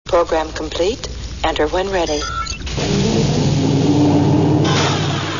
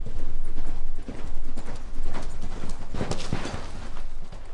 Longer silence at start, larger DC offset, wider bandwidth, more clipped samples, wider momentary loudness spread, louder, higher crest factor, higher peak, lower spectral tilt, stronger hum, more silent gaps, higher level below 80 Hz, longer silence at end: about the same, 0.05 s vs 0 s; first, 0.7% vs under 0.1%; about the same, 7.4 kHz vs 8 kHz; neither; about the same, 8 LU vs 8 LU; first, -17 LUFS vs -36 LUFS; about the same, 14 dB vs 10 dB; first, -2 dBFS vs -10 dBFS; about the same, -5.5 dB/octave vs -5.5 dB/octave; neither; neither; about the same, -32 dBFS vs -28 dBFS; about the same, 0 s vs 0 s